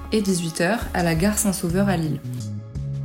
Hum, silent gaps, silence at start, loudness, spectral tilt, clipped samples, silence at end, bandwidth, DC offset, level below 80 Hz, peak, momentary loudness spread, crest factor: none; none; 0 s; -23 LUFS; -5 dB/octave; under 0.1%; 0 s; 16.5 kHz; under 0.1%; -38 dBFS; -8 dBFS; 11 LU; 16 dB